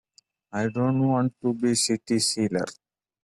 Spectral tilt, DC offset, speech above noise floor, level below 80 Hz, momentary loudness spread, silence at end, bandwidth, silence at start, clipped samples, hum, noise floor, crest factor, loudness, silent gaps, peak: -4.5 dB/octave; under 0.1%; 37 dB; -64 dBFS; 7 LU; 0.5 s; 12.5 kHz; 0.55 s; under 0.1%; none; -61 dBFS; 16 dB; -25 LUFS; none; -10 dBFS